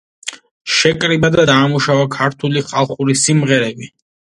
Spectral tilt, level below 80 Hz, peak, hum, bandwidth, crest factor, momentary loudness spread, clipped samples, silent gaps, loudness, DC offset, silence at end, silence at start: -4 dB/octave; -48 dBFS; 0 dBFS; none; 11.5 kHz; 16 dB; 17 LU; under 0.1%; 0.51-0.65 s; -14 LUFS; under 0.1%; 0.45 s; 0.25 s